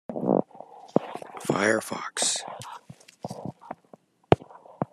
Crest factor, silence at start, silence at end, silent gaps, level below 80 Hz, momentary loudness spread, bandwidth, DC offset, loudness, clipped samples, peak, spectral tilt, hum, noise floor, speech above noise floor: 28 dB; 0.1 s; 0.1 s; none; -60 dBFS; 19 LU; 13.5 kHz; under 0.1%; -27 LUFS; under 0.1%; 0 dBFS; -4 dB/octave; none; -56 dBFS; 29 dB